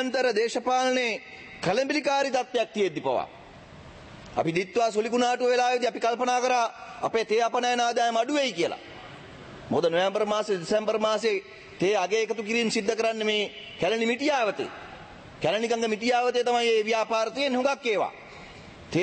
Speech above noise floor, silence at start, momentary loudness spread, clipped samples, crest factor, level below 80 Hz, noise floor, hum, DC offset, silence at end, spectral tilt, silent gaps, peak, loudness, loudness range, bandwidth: 21 dB; 0 s; 18 LU; under 0.1%; 16 dB; -62 dBFS; -47 dBFS; none; under 0.1%; 0 s; -3.5 dB/octave; none; -10 dBFS; -26 LUFS; 3 LU; 8.8 kHz